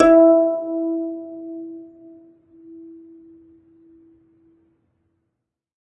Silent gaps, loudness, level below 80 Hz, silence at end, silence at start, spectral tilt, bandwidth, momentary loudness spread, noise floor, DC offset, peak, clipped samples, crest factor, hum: none; -18 LUFS; -56 dBFS; 3.1 s; 0 s; -7 dB/octave; 5.8 kHz; 30 LU; -79 dBFS; under 0.1%; -2 dBFS; under 0.1%; 20 dB; none